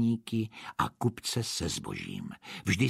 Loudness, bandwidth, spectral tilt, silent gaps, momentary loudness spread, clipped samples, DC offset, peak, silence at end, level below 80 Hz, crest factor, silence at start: -34 LUFS; 15.5 kHz; -4.5 dB/octave; none; 8 LU; under 0.1%; under 0.1%; -12 dBFS; 0 s; -56 dBFS; 20 dB; 0 s